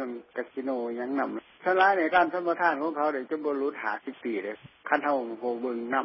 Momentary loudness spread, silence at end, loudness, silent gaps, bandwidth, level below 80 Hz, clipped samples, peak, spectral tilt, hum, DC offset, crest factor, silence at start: 11 LU; 0 s; -28 LUFS; none; 5.8 kHz; -76 dBFS; under 0.1%; -8 dBFS; -8.5 dB/octave; none; under 0.1%; 20 dB; 0 s